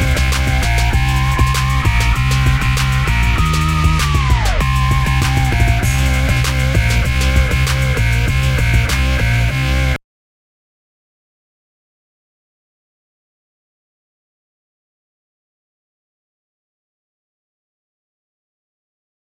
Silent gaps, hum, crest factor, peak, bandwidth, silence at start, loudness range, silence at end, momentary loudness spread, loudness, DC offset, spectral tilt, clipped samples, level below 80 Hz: none; none; 16 dB; 0 dBFS; 16.5 kHz; 0 s; 5 LU; 9.25 s; 1 LU; -15 LUFS; under 0.1%; -5 dB/octave; under 0.1%; -20 dBFS